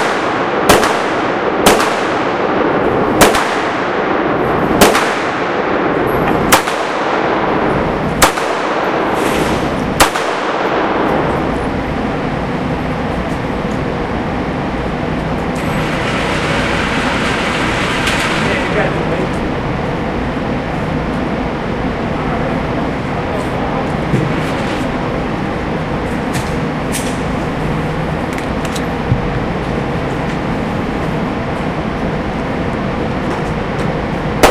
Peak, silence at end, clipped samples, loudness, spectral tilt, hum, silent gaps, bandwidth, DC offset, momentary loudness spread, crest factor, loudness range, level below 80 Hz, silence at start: 0 dBFS; 0 s; under 0.1%; -15 LUFS; -5 dB/octave; none; none; 15.5 kHz; under 0.1%; 7 LU; 16 dB; 5 LU; -30 dBFS; 0 s